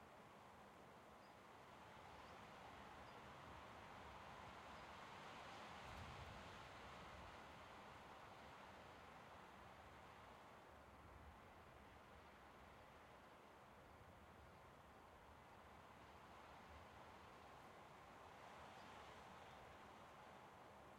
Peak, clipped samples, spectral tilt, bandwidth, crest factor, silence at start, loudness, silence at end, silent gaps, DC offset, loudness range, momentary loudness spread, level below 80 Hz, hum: -46 dBFS; under 0.1%; -4.5 dB/octave; 16.5 kHz; 16 dB; 0 s; -61 LUFS; 0 s; none; under 0.1%; 7 LU; 7 LU; -74 dBFS; none